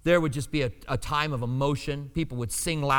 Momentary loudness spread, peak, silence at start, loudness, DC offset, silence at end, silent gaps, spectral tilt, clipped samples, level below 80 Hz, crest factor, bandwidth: 7 LU; -8 dBFS; 0.05 s; -28 LUFS; under 0.1%; 0 s; none; -5 dB/octave; under 0.1%; -42 dBFS; 18 dB; 19 kHz